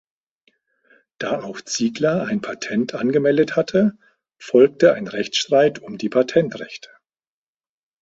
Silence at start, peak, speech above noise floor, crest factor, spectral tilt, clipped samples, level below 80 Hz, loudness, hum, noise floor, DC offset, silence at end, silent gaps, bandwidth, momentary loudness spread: 1.2 s; -2 dBFS; over 71 dB; 18 dB; -5 dB/octave; under 0.1%; -62 dBFS; -19 LUFS; none; under -90 dBFS; under 0.1%; 1.25 s; none; 8 kHz; 12 LU